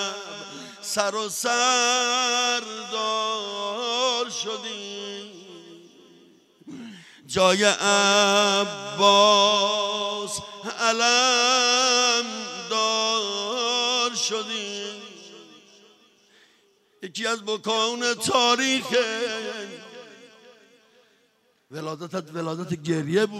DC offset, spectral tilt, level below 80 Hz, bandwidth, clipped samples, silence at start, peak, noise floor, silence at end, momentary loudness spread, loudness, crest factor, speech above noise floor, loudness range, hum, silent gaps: under 0.1%; -1.5 dB/octave; -72 dBFS; 16 kHz; under 0.1%; 0 s; -4 dBFS; -65 dBFS; 0 s; 18 LU; -22 LUFS; 22 dB; 43 dB; 14 LU; none; none